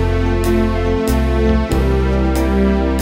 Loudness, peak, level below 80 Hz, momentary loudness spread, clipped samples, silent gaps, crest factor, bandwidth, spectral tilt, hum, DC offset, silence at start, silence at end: -16 LUFS; -2 dBFS; -18 dBFS; 2 LU; under 0.1%; none; 12 dB; 16.5 kHz; -7 dB/octave; none; under 0.1%; 0 s; 0 s